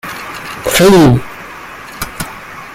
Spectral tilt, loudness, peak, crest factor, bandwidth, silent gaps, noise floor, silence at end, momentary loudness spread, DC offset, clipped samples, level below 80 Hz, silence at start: -5 dB/octave; -10 LUFS; 0 dBFS; 14 dB; 16.5 kHz; none; -30 dBFS; 0 s; 22 LU; under 0.1%; under 0.1%; -34 dBFS; 0.05 s